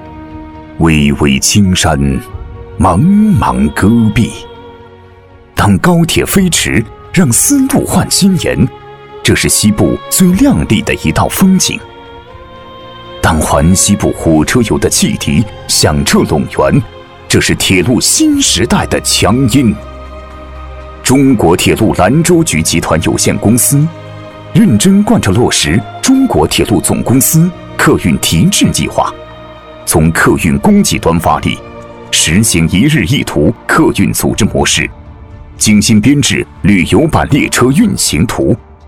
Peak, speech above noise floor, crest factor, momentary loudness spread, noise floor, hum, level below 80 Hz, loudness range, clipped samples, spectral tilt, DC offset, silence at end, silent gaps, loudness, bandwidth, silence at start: 0 dBFS; 28 dB; 10 dB; 10 LU; -37 dBFS; none; -28 dBFS; 2 LU; under 0.1%; -4.5 dB/octave; under 0.1%; 0.25 s; none; -9 LUFS; 19 kHz; 0 s